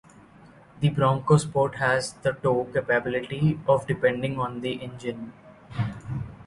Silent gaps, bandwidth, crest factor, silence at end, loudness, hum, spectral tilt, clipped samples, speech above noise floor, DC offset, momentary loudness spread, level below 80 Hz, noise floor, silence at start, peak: none; 11.5 kHz; 20 dB; 0.05 s; -25 LUFS; none; -6.5 dB/octave; under 0.1%; 27 dB; under 0.1%; 13 LU; -54 dBFS; -51 dBFS; 0.75 s; -6 dBFS